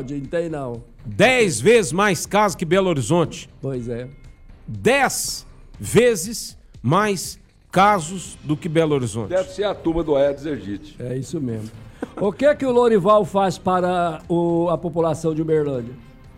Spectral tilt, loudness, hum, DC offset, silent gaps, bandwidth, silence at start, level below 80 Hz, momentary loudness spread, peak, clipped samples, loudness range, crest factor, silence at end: -5 dB/octave; -20 LUFS; none; under 0.1%; none; 16 kHz; 0 s; -44 dBFS; 16 LU; -6 dBFS; under 0.1%; 4 LU; 16 dB; 0.05 s